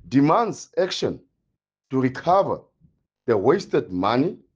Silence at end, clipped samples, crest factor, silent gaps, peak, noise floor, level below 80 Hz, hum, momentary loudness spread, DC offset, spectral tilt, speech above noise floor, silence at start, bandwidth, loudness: 0.2 s; under 0.1%; 18 dB; none; -4 dBFS; -78 dBFS; -60 dBFS; none; 9 LU; under 0.1%; -6.5 dB/octave; 57 dB; 0.05 s; 7.8 kHz; -22 LUFS